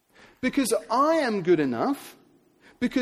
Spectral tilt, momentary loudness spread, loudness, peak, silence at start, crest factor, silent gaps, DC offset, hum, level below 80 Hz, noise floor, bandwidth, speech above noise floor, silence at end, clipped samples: -5 dB/octave; 9 LU; -25 LUFS; -10 dBFS; 0.45 s; 16 dB; none; under 0.1%; none; -62 dBFS; -58 dBFS; 15 kHz; 34 dB; 0 s; under 0.1%